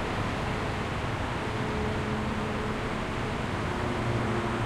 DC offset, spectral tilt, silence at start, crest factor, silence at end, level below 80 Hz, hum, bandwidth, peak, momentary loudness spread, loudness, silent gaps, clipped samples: under 0.1%; -6 dB/octave; 0 s; 14 dB; 0 s; -40 dBFS; none; 14 kHz; -16 dBFS; 2 LU; -31 LUFS; none; under 0.1%